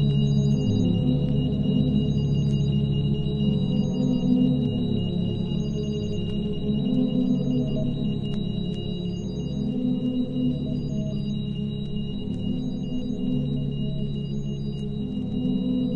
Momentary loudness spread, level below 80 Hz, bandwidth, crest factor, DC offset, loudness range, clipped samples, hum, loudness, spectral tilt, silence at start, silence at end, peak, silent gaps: 7 LU; -38 dBFS; 7 kHz; 14 dB; under 0.1%; 5 LU; under 0.1%; none; -26 LUFS; -9 dB/octave; 0 s; 0 s; -10 dBFS; none